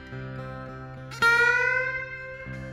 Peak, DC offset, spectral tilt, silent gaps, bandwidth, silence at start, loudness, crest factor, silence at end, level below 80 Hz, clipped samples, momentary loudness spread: -10 dBFS; under 0.1%; -4 dB/octave; none; 16 kHz; 0 s; -22 LUFS; 18 dB; 0 s; -52 dBFS; under 0.1%; 20 LU